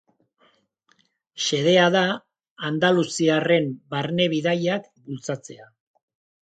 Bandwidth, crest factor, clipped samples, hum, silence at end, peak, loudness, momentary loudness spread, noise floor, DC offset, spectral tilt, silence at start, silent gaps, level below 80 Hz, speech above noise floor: 9.2 kHz; 20 dB; under 0.1%; none; 0.8 s; -4 dBFS; -22 LUFS; 15 LU; -65 dBFS; under 0.1%; -4.5 dB/octave; 1.35 s; 2.51-2.56 s; -70 dBFS; 43 dB